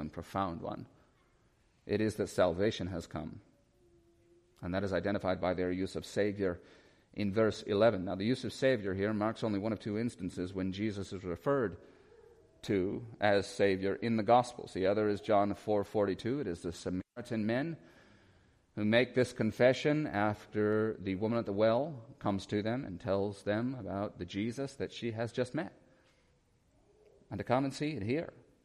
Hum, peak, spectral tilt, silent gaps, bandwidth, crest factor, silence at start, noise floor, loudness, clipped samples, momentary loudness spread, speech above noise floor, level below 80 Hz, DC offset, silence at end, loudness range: none; -14 dBFS; -6.5 dB/octave; none; 13.5 kHz; 22 dB; 0 s; -70 dBFS; -34 LUFS; under 0.1%; 11 LU; 37 dB; -64 dBFS; under 0.1%; 0.35 s; 6 LU